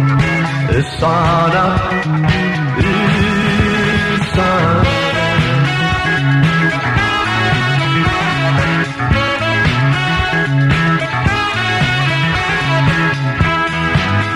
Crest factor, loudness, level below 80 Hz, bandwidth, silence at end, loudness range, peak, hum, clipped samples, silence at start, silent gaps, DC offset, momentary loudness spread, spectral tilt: 12 dB; -14 LUFS; -30 dBFS; 11.5 kHz; 0 s; 1 LU; -2 dBFS; none; under 0.1%; 0 s; none; under 0.1%; 3 LU; -6 dB/octave